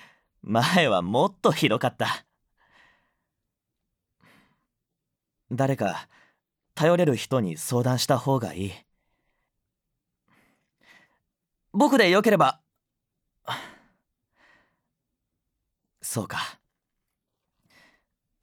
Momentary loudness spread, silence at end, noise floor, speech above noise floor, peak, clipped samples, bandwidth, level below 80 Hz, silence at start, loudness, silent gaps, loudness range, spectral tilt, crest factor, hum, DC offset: 17 LU; 1.9 s; -84 dBFS; 61 dB; -4 dBFS; under 0.1%; 19 kHz; -70 dBFS; 0.45 s; -24 LUFS; none; 13 LU; -5 dB/octave; 22 dB; none; under 0.1%